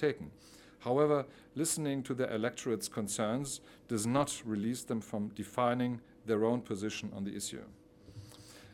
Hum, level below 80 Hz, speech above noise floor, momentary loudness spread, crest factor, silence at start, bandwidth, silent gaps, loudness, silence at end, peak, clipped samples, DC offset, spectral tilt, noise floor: none; -68 dBFS; 19 dB; 14 LU; 20 dB; 0 s; 17 kHz; none; -35 LUFS; 0 s; -16 dBFS; under 0.1%; under 0.1%; -5 dB/octave; -54 dBFS